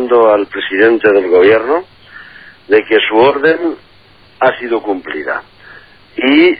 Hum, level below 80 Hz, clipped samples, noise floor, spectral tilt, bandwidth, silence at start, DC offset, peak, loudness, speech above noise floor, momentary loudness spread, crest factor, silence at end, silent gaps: none; -54 dBFS; under 0.1%; -44 dBFS; -8 dB/octave; 5 kHz; 0 s; 0.3%; 0 dBFS; -12 LUFS; 34 dB; 11 LU; 12 dB; 0 s; none